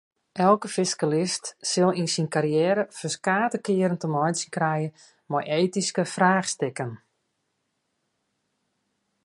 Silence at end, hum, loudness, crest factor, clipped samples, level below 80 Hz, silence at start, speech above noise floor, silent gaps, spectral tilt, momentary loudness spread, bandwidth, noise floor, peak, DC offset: 2.3 s; none; -25 LUFS; 20 dB; under 0.1%; -74 dBFS; 0.35 s; 52 dB; none; -4.5 dB/octave; 8 LU; 11.5 kHz; -76 dBFS; -6 dBFS; under 0.1%